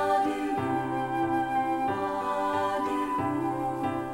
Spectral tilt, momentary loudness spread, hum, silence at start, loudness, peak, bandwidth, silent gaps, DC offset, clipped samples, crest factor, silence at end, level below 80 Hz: -6.5 dB/octave; 3 LU; none; 0 s; -29 LUFS; -16 dBFS; 16.5 kHz; none; under 0.1%; under 0.1%; 14 dB; 0 s; -56 dBFS